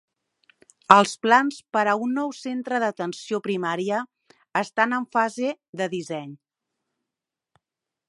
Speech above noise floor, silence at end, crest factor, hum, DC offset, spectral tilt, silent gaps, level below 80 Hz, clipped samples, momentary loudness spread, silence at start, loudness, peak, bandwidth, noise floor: 64 dB; 1.75 s; 24 dB; none; under 0.1%; -4.5 dB/octave; 5.69-5.73 s; -78 dBFS; under 0.1%; 15 LU; 0.9 s; -23 LUFS; 0 dBFS; 11.5 kHz; -87 dBFS